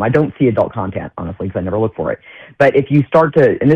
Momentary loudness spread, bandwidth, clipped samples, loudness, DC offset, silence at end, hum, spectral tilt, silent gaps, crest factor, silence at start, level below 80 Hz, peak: 12 LU; 7 kHz; under 0.1%; -15 LUFS; under 0.1%; 0 s; none; -9.5 dB/octave; none; 12 dB; 0 s; -44 dBFS; -2 dBFS